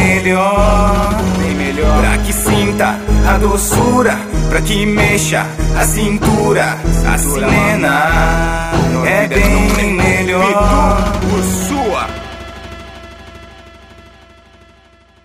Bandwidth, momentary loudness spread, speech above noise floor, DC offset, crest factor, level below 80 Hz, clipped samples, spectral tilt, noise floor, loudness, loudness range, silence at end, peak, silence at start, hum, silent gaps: 16 kHz; 6 LU; 34 dB; under 0.1%; 12 dB; -20 dBFS; under 0.1%; -5 dB/octave; -46 dBFS; -13 LUFS; 7 LU; 1.55 s; 0 dBFS; 0 s; none; none